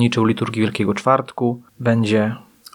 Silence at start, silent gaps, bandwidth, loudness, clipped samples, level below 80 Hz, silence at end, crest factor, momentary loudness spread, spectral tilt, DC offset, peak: 0 s; none; 13 kHz; -19 LUFS; under 0.1%; -60 dBFS; 0.35 s; 18 dB; 6 LU; -6.5 dB/octave; under 0.1%; 0 dBFS